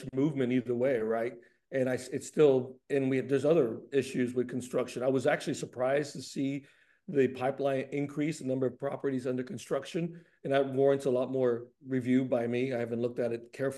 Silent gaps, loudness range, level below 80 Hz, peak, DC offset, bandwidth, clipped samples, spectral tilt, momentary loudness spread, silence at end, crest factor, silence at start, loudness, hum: none; 3 LU; -76 dBFS; -12 dBFS; under 0.1%; 12.5 kHz; under 0.1%; -6.5 dB/octave; 9 LU; 0 s; 18 dB; 0 s; -31 LUFS; none